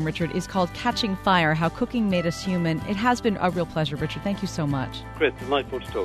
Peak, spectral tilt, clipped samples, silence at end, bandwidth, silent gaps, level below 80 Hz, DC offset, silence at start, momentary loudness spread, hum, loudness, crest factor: -8 dBFS; -6 dB/octave; under 0.1%; 0 s; 13.5 kHz; none; -44 dBFS; under 0.1%; 0 s; 7 LU; none; -25 LUFS; 18 dB